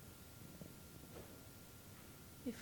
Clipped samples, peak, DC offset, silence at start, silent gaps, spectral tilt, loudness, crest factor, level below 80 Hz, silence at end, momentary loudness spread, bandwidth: under 0.1%; -34 dBFS; under 0.1%; 0 s; none; -4.5 dB/octave; -55 LUFS; 22 dB; -68 dBFS; 0 s; 6 LU; 19 kHz